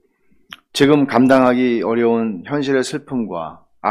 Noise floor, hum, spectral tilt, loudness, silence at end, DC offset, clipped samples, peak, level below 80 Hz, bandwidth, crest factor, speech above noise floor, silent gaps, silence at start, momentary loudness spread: -57 dBFS; none; -5.5 dB/octave; -16 LUFS; 0 s; under 0.1%; under 0.1%; 0 dBFS; -52 dBFS; 14.5 kHz; 16 dB; 42 dB; none; 0.75 s; 13 LU